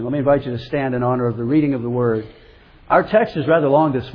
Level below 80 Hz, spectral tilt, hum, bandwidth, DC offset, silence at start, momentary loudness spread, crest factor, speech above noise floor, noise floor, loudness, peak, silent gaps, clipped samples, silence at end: -46 dBFS; -10 dB/octave; none; 5.4 kHz; under 0.1%; 0 s; 7 LU; 18 dB; 28 dB; -46 dBFS; -18 LUFS; 0 dBFS; none; under 0.1%; 0 s